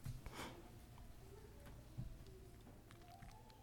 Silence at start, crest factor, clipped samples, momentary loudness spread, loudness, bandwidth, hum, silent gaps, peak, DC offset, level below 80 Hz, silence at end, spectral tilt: 0 s; 20 dB; under 0.1%; 9 LU; -58 LUFS; 19 kHz; none; none; -36 dBFS; under 0.1%; -60 dBFS; 0 s; -5 dB/octave